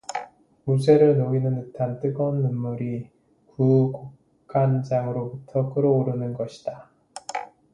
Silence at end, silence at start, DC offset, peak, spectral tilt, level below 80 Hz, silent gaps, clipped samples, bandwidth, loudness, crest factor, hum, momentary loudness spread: 0.3 s; 0.1 s; under 0.1%; -4 dBFS; -8.5 dB/octave; -62 dBFS; none; under 0.1%; 11 kHz; -23 LUFS; 20 dB; none; 16 LU